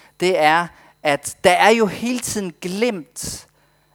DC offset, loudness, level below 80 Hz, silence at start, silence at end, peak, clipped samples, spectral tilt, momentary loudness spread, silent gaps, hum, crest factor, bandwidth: under 0.1%; -18 LUFS; -54 dBFS; 0.2 s; 0.55 s; 0 dBFS; under 0.1%; -3.5 dB/octave; 15 LU; none; none; 20 dB; over 20 kHz